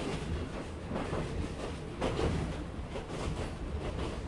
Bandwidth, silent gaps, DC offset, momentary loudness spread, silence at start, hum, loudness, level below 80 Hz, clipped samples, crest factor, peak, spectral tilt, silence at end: 11.5 kHz; none; under 0.1%; 7 LU; 0 s; none; -37 LUFS; -42 dBFS; under 0.1%; 16 dB; -20 dBFS; -6 dB/octave; 0 s